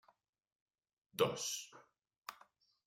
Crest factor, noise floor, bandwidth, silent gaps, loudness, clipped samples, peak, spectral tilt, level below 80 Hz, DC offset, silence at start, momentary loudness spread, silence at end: 26 dB; -69 dBFS; 16 kHz; none; -39 LUFS; under 0.1%; -20 dBFS; -2.5 dB/octave; -82 dBFS; under 0.1%; 1.15 s; 18 LU; 0.55 s